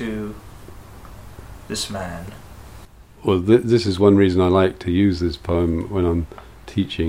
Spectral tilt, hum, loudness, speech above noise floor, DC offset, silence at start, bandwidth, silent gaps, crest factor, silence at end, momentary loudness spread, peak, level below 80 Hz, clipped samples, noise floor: -6.5 dB/octave; none; -19 LUFS; 25 dB; 0.2%; 0 s; 15.5 kHz; none; 18 dB; 0 s; 24 LU; -2 dBFS; -38 dBFS; under 0.1%; -43 dBFS